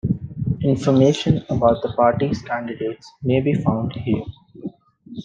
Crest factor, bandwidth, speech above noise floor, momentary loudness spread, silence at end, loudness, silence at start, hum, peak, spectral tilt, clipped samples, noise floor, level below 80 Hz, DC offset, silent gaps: 18 dB; 9 kHz; 23 dB; 19 LU; 0 s; -20 LUFS; 0.05 s; none; -2 dBFS; -7.5 dB/octave; under 0.1%; -42 dBFS; -46 dBFS; under 0.1%; none